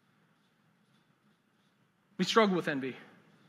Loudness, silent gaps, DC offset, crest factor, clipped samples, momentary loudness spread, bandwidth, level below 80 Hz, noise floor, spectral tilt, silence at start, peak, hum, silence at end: -30 LUFS; none; under 0.1%; 24 dB; under 0.1%; 23 LU; 13.5 kHz; -90 dBFS; -71 dBFS; -5 dB/octave; 2.2 s; -12 dBFS; none; 0.45 s